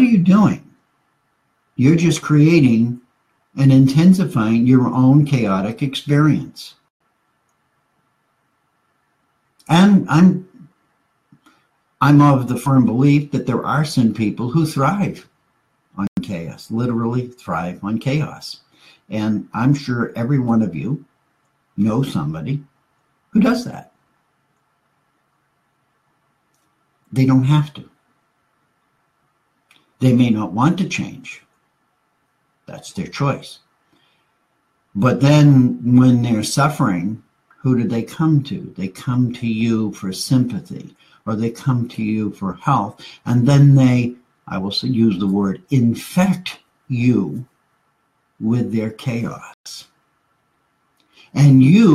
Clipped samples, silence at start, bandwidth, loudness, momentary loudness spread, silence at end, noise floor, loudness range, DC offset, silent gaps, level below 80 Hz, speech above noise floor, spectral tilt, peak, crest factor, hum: under 0.1%; 0 s; 13.5 kHz; -17 LUFS; 17 LU; 0 s; -66 dBFS; 9 LU; under 0.1%; 6.90-7.00 s, 16.08-16.16 s, 49.54-49.64 s; -54 dBFS; 50 dB; -7 dB/octave; 0 dBFS; 16 dB; none